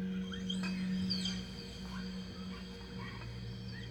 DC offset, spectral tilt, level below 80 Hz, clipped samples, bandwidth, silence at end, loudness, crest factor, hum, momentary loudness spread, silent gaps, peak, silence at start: under 0.1%; -5 dB/octave; -54 dBFS; under 0.1%; 10 kHz; 0 s; -40 LUFS; 16 dB; none; 10 LU; none; -24 dBFS; 0 s